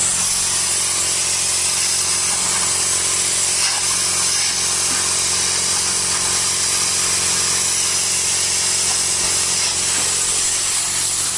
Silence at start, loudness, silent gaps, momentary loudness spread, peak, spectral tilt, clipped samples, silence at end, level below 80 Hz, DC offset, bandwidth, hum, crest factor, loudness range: 0 s; -15 LUFS; none; 1 LU; -4 dBFS; 0.5 dB/octave; under 0.1%; 0 s; -50 dBFS; under 0.1%; 12 kHz; none; 14 dB; 0 LU